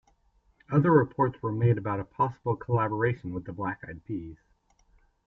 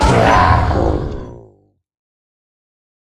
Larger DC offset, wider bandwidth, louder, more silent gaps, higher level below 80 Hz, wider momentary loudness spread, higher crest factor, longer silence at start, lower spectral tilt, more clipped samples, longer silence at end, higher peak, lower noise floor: neither; second, 3.9 kHz vs 12 kHz; second, -28 LUFS vs -13 LUFS; neither; second, -58 dBFS vs -26 dBFS; second, 15 LU vs 19 LU; about the same, 20 dB vs 16 dB; first, 0.7 s vs 0 s; first, -11 dB/octave vs -6 dB/octave; neither; second, 0.9 s vs 1.75 s; second, -8 dBFS vs 0 dBFS; first, -66 dBFS vs -52 dBFS